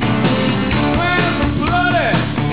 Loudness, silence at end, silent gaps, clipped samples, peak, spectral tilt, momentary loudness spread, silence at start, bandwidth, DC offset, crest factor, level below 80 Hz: -16 LUFS; 0 s; none; under 0.1%; -4 dBFS; -10 dB/octave; 2 LU; 0 s; 4 kHz; 2%; 10 dB; -30 dBFS